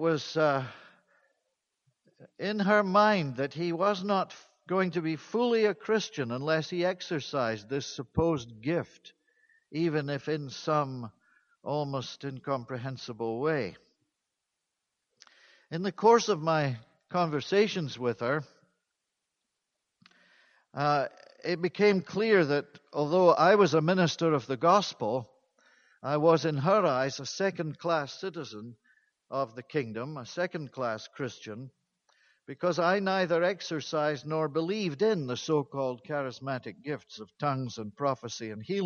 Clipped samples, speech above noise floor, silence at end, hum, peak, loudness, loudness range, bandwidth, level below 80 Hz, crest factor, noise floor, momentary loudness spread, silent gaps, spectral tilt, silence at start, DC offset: under 0.1%; 56 dB; 0 s; none; -8 dBFS; -29 LUFS; 10 LU; 7.2 kHz; -66 dBFS; 22 dB; -85 dBFS; 14 LU; none; -5.5 dB/octave; 0 s; under 0.1%